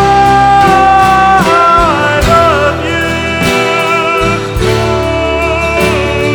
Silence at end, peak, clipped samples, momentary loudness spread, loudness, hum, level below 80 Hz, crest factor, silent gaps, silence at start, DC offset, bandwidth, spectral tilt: 0 s; 0 dBFS; under 0.1%; 6 LU; -8 LUFS; none; -24 dBFS; 8 dB; none; 0 s; under 0.1%; over 20 kHz; -5 dB/octave